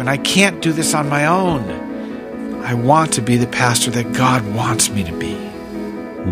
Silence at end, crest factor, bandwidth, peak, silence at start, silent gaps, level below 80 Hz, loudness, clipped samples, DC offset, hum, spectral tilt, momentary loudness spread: 0 s; 18 dB; 16 kHz; 0 dBFS; 0 s; none; -44 dBFS; -16 LUFS; under 0.1%; under 0.1%; none; -4 dB/octave; 14 LU